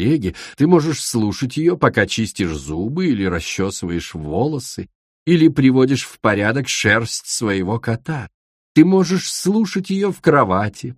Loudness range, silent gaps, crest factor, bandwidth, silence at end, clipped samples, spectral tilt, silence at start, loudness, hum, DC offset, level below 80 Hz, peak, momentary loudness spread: 3 LU; 4.95-5.26 s, 8.34-8.75 s; 18 dB; 15.5 kHz; 0.05 s; under 0.1%; -5.5 dB/octave; 0 s; -18 LUFS; none; under 0.1%; -44 dBFS; 0 dBFS; 11 LU